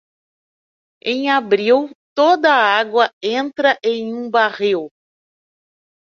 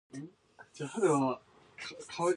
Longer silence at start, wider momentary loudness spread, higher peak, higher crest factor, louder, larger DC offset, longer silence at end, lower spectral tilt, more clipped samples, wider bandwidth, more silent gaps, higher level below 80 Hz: first, 1.05 s vs 0.15 s; second, 10 LU vs 20 LU; first, -2 dBFS vs -16 dBFS; about the same, 16 dB vs 18 dB; first, -16 LUFS vs -33 LUFS; neither; first, 1.25 s vs 0 s; second, -4 dB/octave vs -5.5 dB/octave; neither; second, 7.2 kHz vs 11.5 kHz; first, 1.95-2.16 s, 3.13-3.21 s vs none; first, -68 dBFS vs -78 dBFS